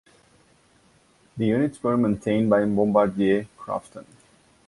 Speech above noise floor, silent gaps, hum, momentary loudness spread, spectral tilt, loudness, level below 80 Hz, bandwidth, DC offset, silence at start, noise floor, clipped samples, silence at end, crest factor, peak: 37 dB; none; none; 12 LU; -8 dB/octave; -23 LUFS; -58 dBFS; 11.5 kHz; under 0.1%; 1.35 s; -59 dBFS; under 0.1%; 0.65 s; 18 dB; -6 dBFS